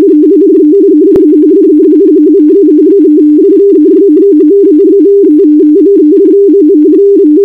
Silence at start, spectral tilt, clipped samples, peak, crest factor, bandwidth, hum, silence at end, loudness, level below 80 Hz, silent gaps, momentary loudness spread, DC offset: 0 s; -9.5 dB/octave; 6%; 0 dBFS; 4 dB; 2.1 kHz; none; 0 s; -4 LUFS; -46 dBFS; none; 0 LU; 0.5%